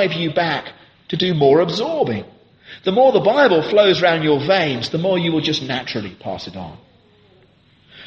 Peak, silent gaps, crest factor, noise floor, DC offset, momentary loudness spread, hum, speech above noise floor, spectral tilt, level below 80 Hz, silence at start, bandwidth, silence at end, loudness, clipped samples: -2 dBFS; none; 16 dB; -53 dBFS; under 0.1%; 15 LU; none; 36 dB; -6 dB/octave; -58 dBFS; 0 s; 8 kHz; 0 s; -17 LUFS; under 0.1%